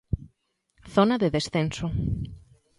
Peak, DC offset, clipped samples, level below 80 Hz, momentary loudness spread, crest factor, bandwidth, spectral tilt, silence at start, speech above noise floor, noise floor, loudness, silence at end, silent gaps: -6 dBFS; under 0.1%; under 0.1%; -42 dBFS; 12 LU; 22 dB; 11.5 kHz; -6.5 dB/octave; 0.1 s; 47 dB; -71 dBFS; -26 LUFS; 0.4 s; none